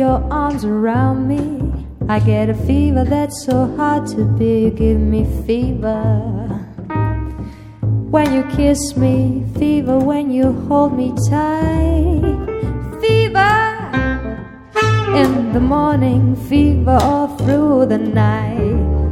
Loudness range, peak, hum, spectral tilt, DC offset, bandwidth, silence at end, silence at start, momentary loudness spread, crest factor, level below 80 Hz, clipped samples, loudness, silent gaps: 4 LU; 0 dBFS; none; -7 dB/octave; under 0.1%; 14 kHz; 0 s; 0 s; 9 LU; 14 dB; -26 dBFS; under 0.1%; -16 LUFS; none